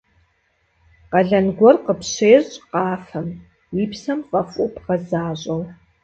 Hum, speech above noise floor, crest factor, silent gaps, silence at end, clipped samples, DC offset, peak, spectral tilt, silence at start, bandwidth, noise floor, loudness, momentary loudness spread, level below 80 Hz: none; 46 dB; 20 dB; none; 0.3 s; under 0.1%; under 0.1%; 0 dBFS; -6 dB/octave; 1.1 s; 8.2 kHz; -65 dBFS; -19 LUFS; 15 LU; -54 dBFS